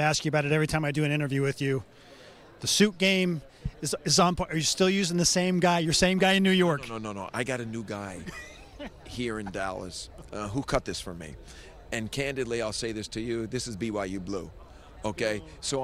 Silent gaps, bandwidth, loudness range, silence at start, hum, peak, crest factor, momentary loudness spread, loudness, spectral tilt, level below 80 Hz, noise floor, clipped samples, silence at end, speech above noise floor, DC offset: none; 15 kHz; 11 LU; 0 s; none; -8 dBFS; 20 dB; 17 LU; -27 LUFS; -4 dB/octave; -50 dBFS; -50 dBFS; under 0.1%; 0 s; 23 dB; under 0.1%